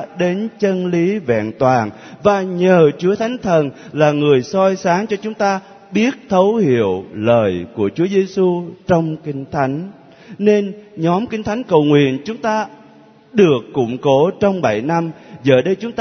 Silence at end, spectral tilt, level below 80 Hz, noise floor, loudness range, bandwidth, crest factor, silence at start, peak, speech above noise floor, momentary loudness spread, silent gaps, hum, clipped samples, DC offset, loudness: 0 s; -7 dB/octave; -54 dBFS; -45 dBFS; 3 LU; 6.6 kHz; 16 dB; 0 s; 0 dBFS; 29 dB; 8 LU; none; none; under 0.1%; under 0.1%; -16 LUFS